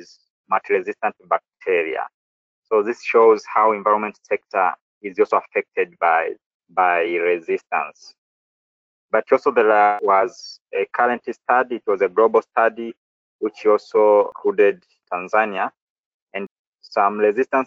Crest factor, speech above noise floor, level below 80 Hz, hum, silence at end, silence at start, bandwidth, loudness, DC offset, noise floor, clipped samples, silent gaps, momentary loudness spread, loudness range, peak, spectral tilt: 18 dB; over 71 dB; -72 dBFS; none; 0 s; 0.5 s; 7.4 kHz; -19 LUFS; under 0.1%; under -90 dBFS; under 0.1%; 2.14-2.62 s, 4.81-5.01 s, 6.46-6.60 s, 8.18-9.09 s, 10.61-10.65 s, 12.97-13.39 s, 15.81-16.27 s, 16.51-16.72 s; 13 LU; 3 LU; -2 dBFS; -5.5 dB/octave